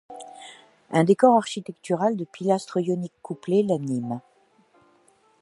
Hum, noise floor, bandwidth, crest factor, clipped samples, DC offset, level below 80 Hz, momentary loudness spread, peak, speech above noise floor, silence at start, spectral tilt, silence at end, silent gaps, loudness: none; -61 dBFS; 11.5 kHz; 22 dB; under 0.1%; under 0.1%; -74 dBFS; 23 LU; -4 dBFS; 38 dB; 0.1 s; -6.5 dB/octave; 1.2 s; none; -24 LUFS